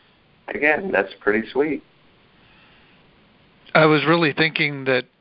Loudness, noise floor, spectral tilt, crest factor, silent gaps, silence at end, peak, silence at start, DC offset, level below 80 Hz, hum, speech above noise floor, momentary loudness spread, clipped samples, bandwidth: -19 LUFS; -55 dBFS; -10 dB/octave; 22 dB; none; 0.2 s; 0 dBFS; 0.5 s; under 0.1%; -60 dBFS; none; 36 dB; 8 LU; under 0.1%; 5.6 kHz